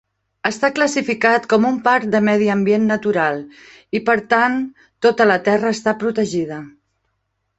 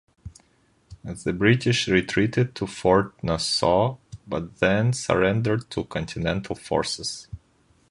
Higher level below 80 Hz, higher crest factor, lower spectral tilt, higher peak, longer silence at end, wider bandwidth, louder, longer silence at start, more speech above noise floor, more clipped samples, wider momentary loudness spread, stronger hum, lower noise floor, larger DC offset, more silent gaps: second, -60 dBFS vs -46 dBFS; about the same, 16 dB vs 20 dB; about the same, -5 dB/octave vs -5 dB/octave; about the same, -2 dBFS vs -4 dBFS; first, 0.9 s vs 0.55 s; second, 8.2 kHz vs 11.5 kHz; first, -17 LUFS vs -24 LUFS; first, 0.45 s vs 0.25 s; first, 54 dB vs 39 dB; neither; about the same, 9 LU vs 11 LU; neither; first, -71 dBFS vs -63 dBFS; neither; neither